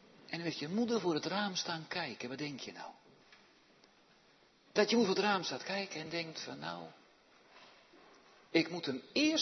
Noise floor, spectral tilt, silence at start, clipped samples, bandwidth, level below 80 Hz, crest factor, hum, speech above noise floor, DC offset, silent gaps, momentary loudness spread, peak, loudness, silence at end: -67 dBFS; -2.5 dB/octave; 0.3 s; under 0.1%; 6.2 kHz; -84 dBFS; 24 dB; none; 31 dB; under 0.1%; none; 14 LU; -14 dBFS; -36 LUFS; 0 s